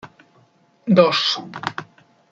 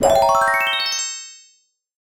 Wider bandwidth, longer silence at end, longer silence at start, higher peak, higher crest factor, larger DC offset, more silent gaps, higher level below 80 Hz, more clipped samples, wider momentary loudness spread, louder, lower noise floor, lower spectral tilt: second, 7.6 kHz vs 17 kHz; second, 0.5 s vs 0.75 s; about the same, 0.05 s vs 0 s; about the same, -2 dBFS vs -2 dBFS; about the same, 20 dB vs 18 dB; neither; neither; second, -68 dBFS vs -48 dBFS; neither; about the same, 18 LU vs 16 LU; about the same, -18 LUFS vs -17 LUFS; about the same, -57 dBFS vs -59 dBFS; first, -5.5 dB/octave vs -1 dB/octave